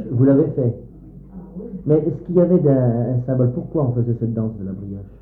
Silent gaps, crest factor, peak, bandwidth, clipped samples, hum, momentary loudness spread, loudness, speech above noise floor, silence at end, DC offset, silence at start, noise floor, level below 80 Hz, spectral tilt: none; 14 dB; -4 dBFS; 2.2 kHz; under 0.1%; none; 18 LU; -19 LUFS; 20 dB; 0.05 s; under 0.1%; 0 s; -38 dBFS; -44 dBFS; -14 dB/octave